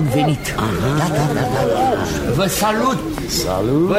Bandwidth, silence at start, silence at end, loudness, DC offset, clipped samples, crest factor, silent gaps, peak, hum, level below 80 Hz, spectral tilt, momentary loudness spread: 16 kHz; 0 s; 0 s; -18 LUFS; under 0.1%; under 0.1%; 14 dB; none; -4 dBFS; none; -34 dBFS; -5 dB/octave; 4 LU